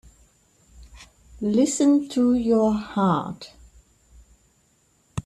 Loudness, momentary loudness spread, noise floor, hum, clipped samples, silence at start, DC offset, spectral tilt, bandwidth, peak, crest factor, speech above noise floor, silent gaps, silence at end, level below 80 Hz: -21 LUFS; 17 LU; -63 dBFS; none; under 0.1%; 0.8 s; under 0.1%; -6 dB/octave; 12.5 kHz; -8 dBFS; 16 dB; 43 dB; none; 0.05 s; -52 dBFS